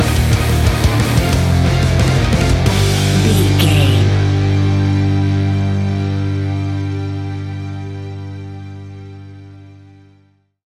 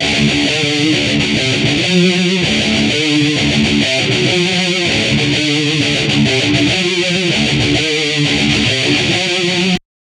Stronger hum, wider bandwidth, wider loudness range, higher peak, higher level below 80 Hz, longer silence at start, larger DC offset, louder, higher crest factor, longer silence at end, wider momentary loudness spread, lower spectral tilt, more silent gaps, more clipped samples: first, 50 Hz at -35 dBFS vs none; first, 15.5 kHz vs 12 kHz; first, 13 LU vs 0 LU; about the same, 0 dBFS vs 0 dBFS; first, -26 dBFS vs -36 dBFS; about the same, 0 s vs 0 s; neither; second, -15 LUFS vs -12 LUFS; about the same, 14 dB vs 14 dB; first, 0.95 s vs 0.25 s; first, 17 LU vs 1 LU; first, -6 dB/octave vs -4 dB/octave; neither; neither